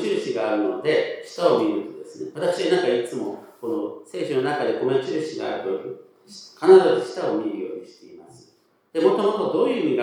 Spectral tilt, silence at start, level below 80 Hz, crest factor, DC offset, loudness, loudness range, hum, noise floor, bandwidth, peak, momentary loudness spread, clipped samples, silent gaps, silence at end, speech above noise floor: -5.5 dB/octave; 0 s; -84 dBFS; 20 dB; under 0.1%; -22 LUFS; 5 LU; none; -60 dBFS; 11.5 kHz; -2 dBFS; 14 LU; under 0.1%; none; 0 s; 38 dB